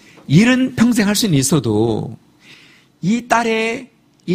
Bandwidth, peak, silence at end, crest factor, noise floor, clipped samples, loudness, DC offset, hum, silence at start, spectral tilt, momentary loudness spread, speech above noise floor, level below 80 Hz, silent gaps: 15.5 kHz; 0 dBFS; 0 s; 16 dB; -47 dBFS; under 0.1%; -16 LUFS; under 0.1%; none; 0.3 s; -5 dB/octave; 12 LU; 32 dB; -48 dBFS; none